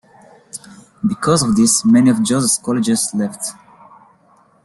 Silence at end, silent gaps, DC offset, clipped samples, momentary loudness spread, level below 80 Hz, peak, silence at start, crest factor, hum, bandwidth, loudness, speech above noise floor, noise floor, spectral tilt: 1.1 s; none; under 0.1%; under 0.1%; 21 LU; -52 dBFS; -2 dBFS; 0.55 s; 16 dB; none; 12.5 kHz; -15 LUFS; 38 dB; -53 dBFS; -4.5 dB/octave